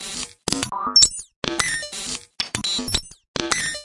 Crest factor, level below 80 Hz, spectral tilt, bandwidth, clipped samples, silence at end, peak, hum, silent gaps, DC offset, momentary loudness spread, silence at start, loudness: 24 dB; -44 dBFS; -0.5 dB/octave; 12 kHz; under 0.1%; 0 s; 0 dBFS; none; 1.36-1.42 s, 3.28-3.34 s; under 0.1%; 15 LU; 0 s; -21 LUFS